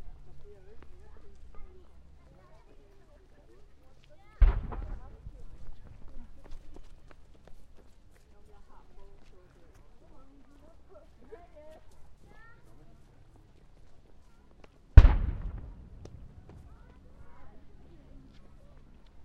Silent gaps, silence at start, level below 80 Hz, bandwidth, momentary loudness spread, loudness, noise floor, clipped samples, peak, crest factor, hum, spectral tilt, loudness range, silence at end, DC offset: none; 0 s; -34 dBFS; 5 kHz; 30 LU; -27 LUFS; -55 dBFS; under 0.1%; 0 dBFS; 32 dB; none; -8.5 dB/octave; 25 LU; 0 s; under 0.1%